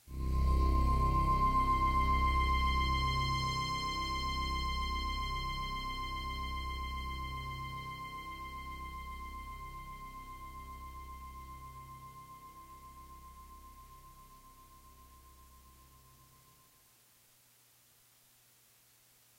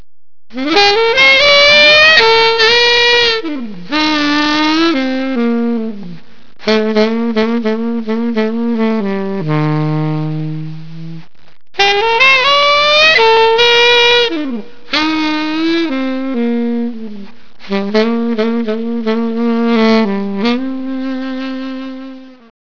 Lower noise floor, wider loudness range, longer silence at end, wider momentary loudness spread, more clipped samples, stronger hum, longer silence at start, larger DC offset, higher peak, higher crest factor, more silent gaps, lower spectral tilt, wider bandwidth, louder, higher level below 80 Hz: first, -66 dBFS vs -33 dBFS; first, 24 LU vs 10 LU; first, 3.55 s vs 0.1 s; first, 22 LU vs 16 LU; neither; neither; second, 0.05 s vs 0.55 s; second, under 0.1% vs 5%; second, -20 dBFS vs 0 dBFS; about the same, 18 dB vs 14 dB; neither; about the same, -5 dB/octave vs -4.5 dB/octave; first, 16 kHz vs 5.4 kHz; second, -35 LUFS vs -11 LUFS; first, -40 dBFS vs -46 dBFS